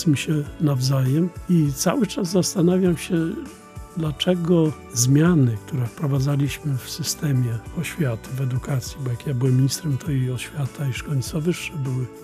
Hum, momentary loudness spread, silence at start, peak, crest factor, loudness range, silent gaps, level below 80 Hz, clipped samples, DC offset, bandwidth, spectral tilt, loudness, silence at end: none; 9 LU; 0 s; -4 dBFS; 16 dB; 4 LU; none; -46 dBFS; under 0.1%; under 0.1%; 15.5 kHz; -6 dB/octave; -22 LUFS; 0 s